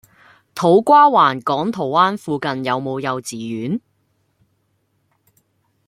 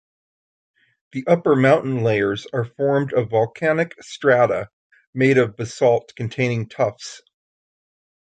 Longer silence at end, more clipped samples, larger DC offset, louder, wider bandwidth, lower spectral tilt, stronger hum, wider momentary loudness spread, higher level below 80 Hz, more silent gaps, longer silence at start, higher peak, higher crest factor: first, 2.1 s vs 1.15 s; neither; neither; first, -17 LUFS vs -20 LUFS; first, 16 kHz vs 9.2 kHz; about the same, -5.5 dB/octave vs -6.5 dB/octave; neither; first, 15 LU vs 12 LU; second, -64 dBFS vs -58 dBFS; second, none vs 4.73-4.90 s, 5.07-5.13 s; second, 0.55 s vs 1.15 s; about the same, -2 dBFS vs -2 dBFS; about the same, 18 dB vs 18 dB